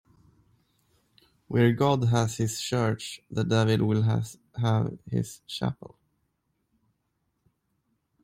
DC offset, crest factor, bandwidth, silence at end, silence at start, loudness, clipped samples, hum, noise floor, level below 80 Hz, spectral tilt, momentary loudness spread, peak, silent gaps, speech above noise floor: under 0.1%; 18 dB; 15.5 kHz; 2.5 s; 1.5 s; -27 LUFS; under 0.1%; none; -77 dBFS; -60 dBFS; -6 dB/octave; 10 LU; -10 dBFS; none; 51 dB